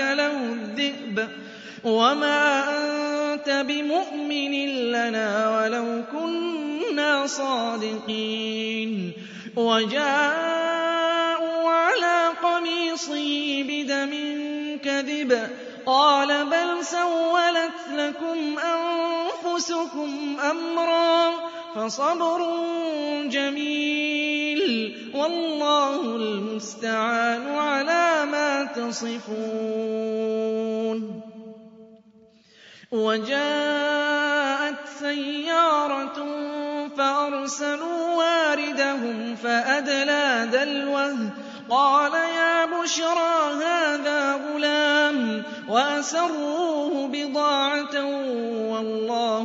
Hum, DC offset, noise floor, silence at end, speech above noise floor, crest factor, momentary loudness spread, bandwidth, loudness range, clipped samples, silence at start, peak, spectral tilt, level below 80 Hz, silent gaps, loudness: none; under 0.1%; -55 dBFS; 0 s; 31 dB; 18 dB; 9 LU; 7.8 kHz; 4 LU; under 0.1%; 0 s; -6 dBFS; -3 dB/octave; -78 dBFS; none; -24 LUFS